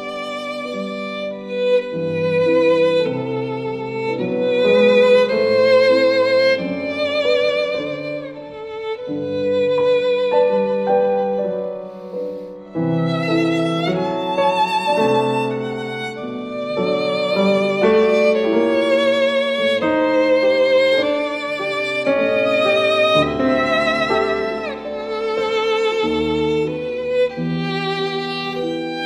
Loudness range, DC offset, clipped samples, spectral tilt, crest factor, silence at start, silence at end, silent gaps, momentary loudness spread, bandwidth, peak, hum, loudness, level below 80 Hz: 5 LU; under 0.1%; under 0.1%; -6 dB/octave; 16 dB; 0 s; 0 s; none; 11 LU; 10.5 kHz; -2 dBFS; none; -18 LUFS; -54 dBFS